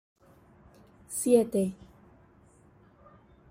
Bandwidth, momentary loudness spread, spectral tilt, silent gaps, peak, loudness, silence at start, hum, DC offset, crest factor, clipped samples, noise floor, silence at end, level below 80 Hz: 16 kHz; 15 LU; -6 dB/octave; none; -10 dBFS; -27 LUFS; 1.1 s; none; under 0.1%; 22 dB; under 0.1%; -59 dBFS; 1.75 s; -64 dBFS